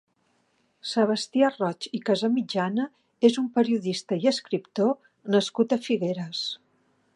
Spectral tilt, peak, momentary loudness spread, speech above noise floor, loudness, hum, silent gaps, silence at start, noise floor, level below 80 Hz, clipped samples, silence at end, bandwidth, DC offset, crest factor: -5.5 dB/octave; -6 dBFS; 8 LU; 44 dB; -26 LUFS; none; none; 0.85 s; -69 dBFS; -78 dBFS; under 0.1%; 0.6 s; 11 kHz; under 0.1%; 20 dB